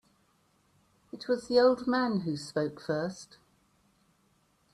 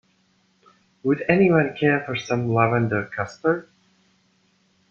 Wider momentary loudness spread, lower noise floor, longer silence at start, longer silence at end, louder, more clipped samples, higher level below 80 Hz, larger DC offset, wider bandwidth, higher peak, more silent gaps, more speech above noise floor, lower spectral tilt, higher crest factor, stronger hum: first, 22 LU vs 9 LU; first, -70 dBFS vs -64 dBFS; about the same, 1.15 s vs 1.05 s; first, 1.5 s vs 1.3 s; second, -29 LUFS vs -22 LUFS; neither; second, -70 dBFS vs -60 dBFS; neither; first, 11.5 kHz vs 7.2 kHz; second, -14 dBFS vs -2 dBFS; neither; about the same, 41 dB vs 43 dB; second, -6 dB/octave vs -7.5 dB/octave; about the same, 20 dB vs 22 dB; neither